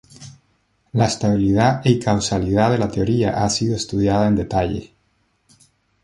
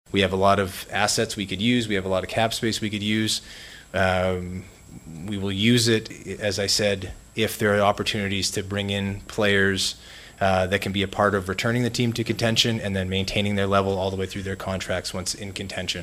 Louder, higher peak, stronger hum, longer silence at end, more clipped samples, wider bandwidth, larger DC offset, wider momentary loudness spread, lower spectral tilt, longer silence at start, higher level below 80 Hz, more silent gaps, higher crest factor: first, -19 LUFS vs -23 LUFS; about the same, -2 dBFS vs -4 dBFS; neither; first, 1.2 s vs 0 s; neither; second, 11.5 kHz vs 15.5 kHz; neither; second, 5 LU vs 10 LU; first, -6 dB/octave vs -4 dB/octave; about the same, 0.2 s vs 0.15 s; first, -40 dBFS vs -50 dBFS; neither; about the same, 18 dB vs 20 dB